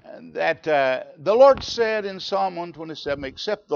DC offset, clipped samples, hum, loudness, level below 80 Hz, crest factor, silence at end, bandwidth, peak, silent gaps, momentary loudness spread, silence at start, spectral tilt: under 0.1%; under 0.1%; none; -21 LUFS; -54 dBFS; 18 dB; 0 s; 7 kHz; -4 dBFS; none; 16 LU; 0.05 s; -4.5 dB/octave